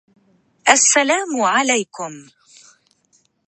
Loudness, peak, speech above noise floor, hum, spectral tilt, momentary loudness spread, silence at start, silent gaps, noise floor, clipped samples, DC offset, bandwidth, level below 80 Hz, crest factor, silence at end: -15 LUFS; 0 dBFS; 44 dB; none; -0.5 dB/octave; 18 LU; 0.65 s; none; -61 dBFS; under 0.1%; under 0.1%; 11.5 kHz; -70 dBFS; 20 dB; 1.25 s